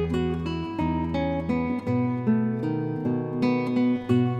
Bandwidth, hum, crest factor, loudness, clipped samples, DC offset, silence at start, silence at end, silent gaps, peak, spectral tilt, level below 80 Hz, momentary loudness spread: 7.8 kHz; none; 16 dB; -26 LUFS; under 0.1%; under 0.1%; 0 s; 0 s; none; -10 dBFS; -9 dB/octave; -44 dBFS; 4 LU